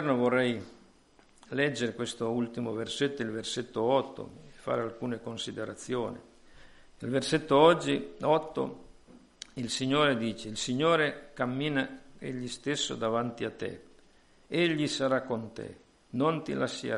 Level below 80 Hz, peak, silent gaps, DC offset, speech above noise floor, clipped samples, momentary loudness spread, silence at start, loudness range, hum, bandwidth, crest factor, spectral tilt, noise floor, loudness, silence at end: -62 dBFS; -8 dBFS; none; under 0.1%; 31 dB; under 0.1%; 14 LU; 0 s; 5 LU; none; 11.5 kHz; 24 dB; -4.5 dB/octave; -61 dBFS; -30 LUFS; 0 s